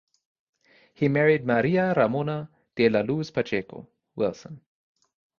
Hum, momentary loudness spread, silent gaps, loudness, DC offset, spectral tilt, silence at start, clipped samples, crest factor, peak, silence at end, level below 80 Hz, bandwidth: none; 21 LU; none; -24 LUFS; under 0.1%; -7.5 dB/octave; 1 s; under 0.1%; 20 dB; -6 dBFS; 0.8 s; -62 dBFS; 7 kHz